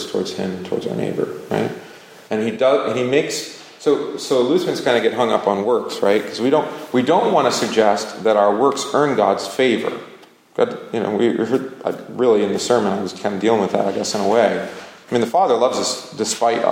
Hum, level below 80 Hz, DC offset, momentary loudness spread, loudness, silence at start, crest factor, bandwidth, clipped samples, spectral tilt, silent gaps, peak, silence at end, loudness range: none; -66 dBFS; under 0.1%; 9 LU; -19 LUFS; 0 s; 18 dB; 16.5 kHz; under 0.1%; -4.5 dB/octave; none; -2 dBFS; 0 s; 4 LU